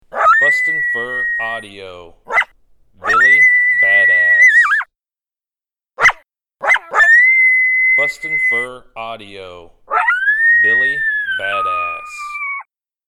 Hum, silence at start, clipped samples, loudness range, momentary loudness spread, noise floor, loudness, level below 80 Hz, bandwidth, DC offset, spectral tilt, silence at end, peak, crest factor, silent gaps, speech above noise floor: none; 0.15 s; under 0.1%; 4 LU; 19 LU; under -90 dBFS; -11 LUFS; -52 dBFS; 12.5 kHz; under 0.1%; -1.5 dB/octave; 0.5 s; -2 dBFS; 14 dB; none; over 70 dB